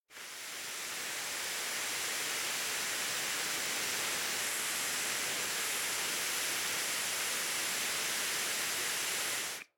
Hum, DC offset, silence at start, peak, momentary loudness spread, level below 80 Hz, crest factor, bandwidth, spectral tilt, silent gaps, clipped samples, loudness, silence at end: none; under 0.1%; 0.1 s; -22 dBFS; 4 LU; -76 dBFS; 14 dB; over 20 kHz; 1 dB/octave; none; under 0.1%; -33 LUFS; 0.15 s